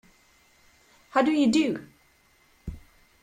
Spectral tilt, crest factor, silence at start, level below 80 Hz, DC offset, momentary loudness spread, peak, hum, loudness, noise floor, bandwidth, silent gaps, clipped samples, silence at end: -5 dB/octave; 20 dB; 1.15 s; -52 dBFS; under 0.1%; 21 LU; -10 dBFS; none; -24 LUFS; -62 dBFS; 14 kHz; none; under 0.1%; 0.45 s